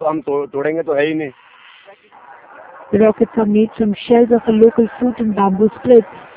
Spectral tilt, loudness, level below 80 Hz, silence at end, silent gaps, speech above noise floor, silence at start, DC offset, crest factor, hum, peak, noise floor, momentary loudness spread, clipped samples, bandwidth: -11.5 dB/octave; -15 LUFS; -50 dBFS; 0.15 s; none; 28 dB; 0 s; under 0.1%; 16 dB; none; 0 dBFS; -43 dBFS; 8 LU; under 0.1%; 4 kHz